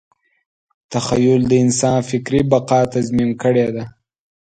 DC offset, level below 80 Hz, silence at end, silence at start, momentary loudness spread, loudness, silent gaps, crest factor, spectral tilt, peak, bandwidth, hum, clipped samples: under 0.1%; -46 dBFS; 0.7 s; 0.9 s; 9 LU; -16 LUFS; none; 16 dB; -6 dB/octave; 0 dBFS; 9.4 kHz; none; under 0.1%